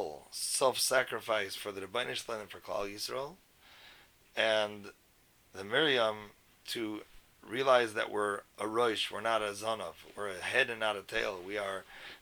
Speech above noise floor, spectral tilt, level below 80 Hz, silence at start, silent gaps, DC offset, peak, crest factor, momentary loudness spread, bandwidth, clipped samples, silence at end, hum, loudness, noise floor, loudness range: 32 dB; -2 dB/octave; -68 dBFS; 0 s; none; under 0.1%; -12 dBFS; 22 dB; 15 LU; over 20 kHz; under 0.1%; 0.05 s; none; -33 LUFS; -66 dBFS; 5 LU